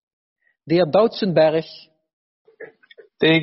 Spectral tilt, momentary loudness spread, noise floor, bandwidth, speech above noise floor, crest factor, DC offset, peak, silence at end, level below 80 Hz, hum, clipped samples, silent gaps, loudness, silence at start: -4 dB/octave; 8 LU; -50 dBFS; 6 kHz; 33 dB; 18 dB; under 0.1%; -4 dBFS; 0 s; -62 dBFS; none; under 0.1%; 2.13-2.45 s; -18 LUFS; 0.65 s